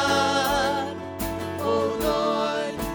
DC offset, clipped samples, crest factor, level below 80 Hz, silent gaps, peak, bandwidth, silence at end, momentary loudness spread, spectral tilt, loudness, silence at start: under 0.1%; under 0.1%; 16 dB; -44 dBFS; none; -10 dBFS; over 20 kHz; 0 s; 9 LU; -4 dB/octave; -25 LUFS; 0 s